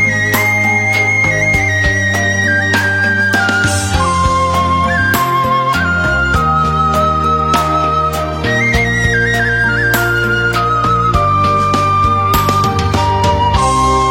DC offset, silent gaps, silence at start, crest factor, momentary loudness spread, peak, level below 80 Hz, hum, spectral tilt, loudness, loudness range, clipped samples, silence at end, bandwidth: under 0.1%; none; 0 s; 12 dB; 2 LU; 0 dBFS; -26 dBFS; none; -4.5 dB/octave; -12 LUFS; 1 LU; under 0.1%; 0 s; 16.5 kHz